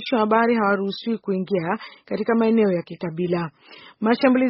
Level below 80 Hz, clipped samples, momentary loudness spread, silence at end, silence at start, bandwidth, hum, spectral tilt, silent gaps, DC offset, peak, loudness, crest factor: -66 dBFS; under 0.1%; 10 LU; 0 s; 0 s; 5.8 kHz; none; -5 dB/octave; none; under 0.1%; -4 dBFS; -22 LUFS; 18 dB